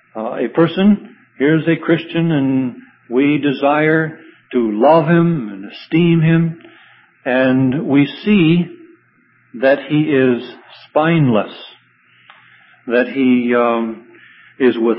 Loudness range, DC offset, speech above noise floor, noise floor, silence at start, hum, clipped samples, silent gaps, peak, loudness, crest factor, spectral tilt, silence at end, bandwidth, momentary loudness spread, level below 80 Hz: 3 LU; under 0.1%; 40 dB; -55 dBFS; 0.15 s; none; under 0.1%; none; 0 dBFS; -15 LUFS; 16 dB; -12.5 dB/octave; 0 s; 5.6 kHz; 13 LU; -56 dBFS